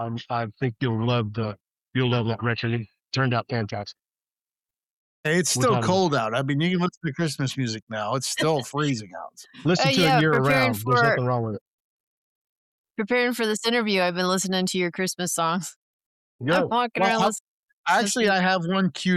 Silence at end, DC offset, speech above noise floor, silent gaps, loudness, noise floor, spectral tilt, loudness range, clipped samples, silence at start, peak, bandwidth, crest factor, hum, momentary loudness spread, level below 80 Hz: 0 s; under 0.1%; over 67 dB; 4.85-5.24 s, 6.97-7.01 s, 7.82-7.87 s, 11.61-12.84 s, 15.76-16.00 s, 16.06-16.39 s, 17.40-17.84 s; -24 LUFS; under -90 dBFS; -4.5 dB/octave; 5 LU; under 0.1%; 0 s; -8 dBFS; 15 kHz; 16 dB; none; 11 LU; -62 dBFS